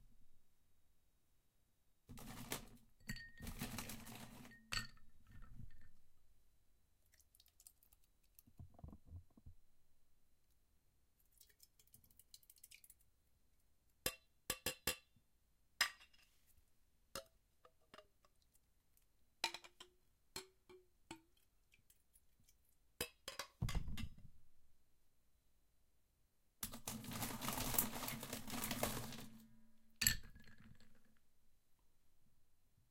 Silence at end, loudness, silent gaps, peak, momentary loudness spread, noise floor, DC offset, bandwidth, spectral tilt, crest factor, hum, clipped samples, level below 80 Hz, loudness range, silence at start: 0.3 s; -45 LUFS; none; -16 dBFS; 24 LU; -79 dBFS; under 0.1%; 16.5 kHz; -2.5 dB/octave; 36 dB; none; under 0.1%; -62 dBFS; 22 LU; 0.05 s